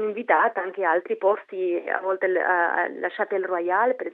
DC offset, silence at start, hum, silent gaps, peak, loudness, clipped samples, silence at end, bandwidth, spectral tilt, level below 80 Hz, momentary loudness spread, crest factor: under 0.1%; 0 s; none; none; -6 dBFS; -24 LUFS; under 0.1%; 0 s; 4.1 kHz; -7.5 dB/octave; under -90 dBFS; 6 LU; 18 dB